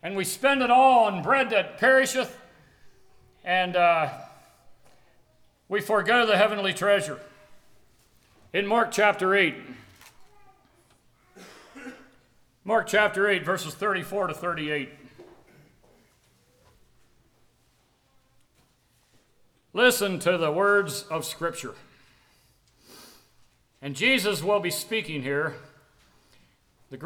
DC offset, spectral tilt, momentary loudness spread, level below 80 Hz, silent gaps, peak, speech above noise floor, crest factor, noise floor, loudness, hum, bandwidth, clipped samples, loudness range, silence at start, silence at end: under 0.1%; -3.5 dB/octave; 19 LU; -68 dBFS; none; -6 dBFS; 42 dB; 22 dB; -66 dBFS; -24 LUFS; none; over 20 kHz; under 0.1%; 7 LU; 0.05 s; 0 s